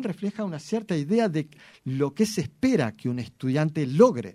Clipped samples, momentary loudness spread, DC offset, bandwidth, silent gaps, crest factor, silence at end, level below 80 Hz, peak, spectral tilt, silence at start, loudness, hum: under 0.1%; 12 LU; under 0.1%; 14.5 kHz; none; 20 dB; 0.05 s; -62 dBFS; -6 dBFS; -6.5 dB/octave; 0 s; -26 LUFS; none